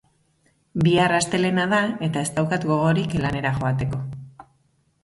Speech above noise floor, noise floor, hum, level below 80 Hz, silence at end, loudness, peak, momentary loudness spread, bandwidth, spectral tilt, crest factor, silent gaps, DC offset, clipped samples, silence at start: 44 dB; -65 dBFS; none; -48 dBFS; 0.6 s; -22 LUFS; -8 dBFS; 10 LU; 11.5 kHz; -5.5 dB/octave; 16 dB; none; under 0.1%; under 0.1%; 0.75 s